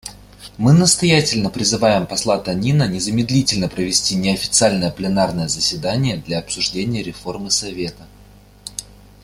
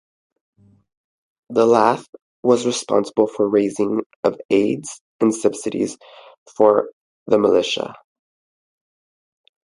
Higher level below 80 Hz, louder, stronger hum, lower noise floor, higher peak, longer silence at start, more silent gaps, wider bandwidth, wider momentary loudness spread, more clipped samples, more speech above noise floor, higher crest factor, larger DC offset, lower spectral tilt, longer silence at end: first, -44 dBFS vs -64 dBFS; about the same, -17 LUFS vs -19 LUFS; first, 50 Hz at -40 dBFS vs none; second, -45 dBFS vs under -90 dBFS; about the same, 0 dBFS vs 0 dBFS; second, 0.05 s vs 1.5 s; second, none vs 2.09-2.13 s, 2.22-2.43 s, 4.06-4.10 s, 4.16-4.23 s, 4.45-4.49 s, 5.01-5.19 s, 6.38-6.46 s, 6.93-7.26 s; first, 15.5 kHz vs 11.5 kHz; first, 15 LU vs 11 LU; neither; second, 27 dB vs over 72 dB; about the same, 18 dB vs 20 dB; neither; about the same, -4 dB/octave vs -4.5 dB/octave; second, 0.4 s vs 1.75 s